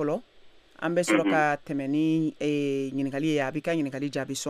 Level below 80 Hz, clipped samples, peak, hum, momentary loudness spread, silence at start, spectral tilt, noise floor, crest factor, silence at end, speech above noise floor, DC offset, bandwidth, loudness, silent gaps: -66 dBFS; under 0.1%; -10 dBFS; none; 7 LU; 0 s; -5.5 dB/octave; -53 dBFS; 18 dB; 0 s; 26 dB; under 0.1%; 14 kHz; -27 LUFS; none